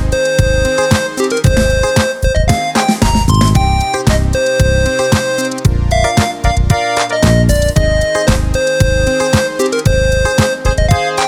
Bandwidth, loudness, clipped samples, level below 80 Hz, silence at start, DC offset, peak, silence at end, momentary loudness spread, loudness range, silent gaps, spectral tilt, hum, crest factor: 17.5 kHz; -13 LUFS; under 0.1%; -18 dBFS; 0 s; under 0.1%; 0 dBFS; 0 s; 3 LU; 1 LU; none; -5 dB/octave; none; 12 dB